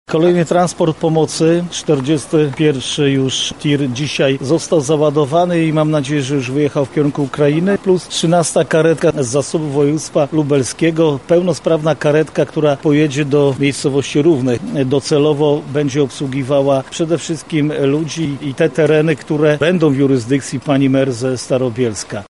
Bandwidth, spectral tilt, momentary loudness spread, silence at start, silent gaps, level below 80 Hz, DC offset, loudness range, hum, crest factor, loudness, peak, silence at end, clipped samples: 11.5 kHz; -5.5 dB/octave; 5 LU; 0.1 s; none; -50 dBFS; 0.3%; 1 LU; none; 12 dB; -15 LUFS; -2 dBFS; 0.05 s; under 0.1%